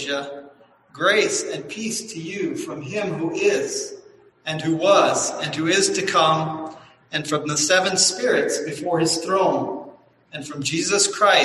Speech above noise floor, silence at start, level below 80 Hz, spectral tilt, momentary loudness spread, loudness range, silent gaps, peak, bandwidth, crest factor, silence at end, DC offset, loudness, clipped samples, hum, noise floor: 25 dB; 0 s; -64 dBFS; -2.5 dB/octave; 14 LU; 5 LU; none; -2 dBFS; 12.5 kHz; 20 dB; 0 s; under 0.1%; -21 LUFS; under 0.1%; none; -46 dBFS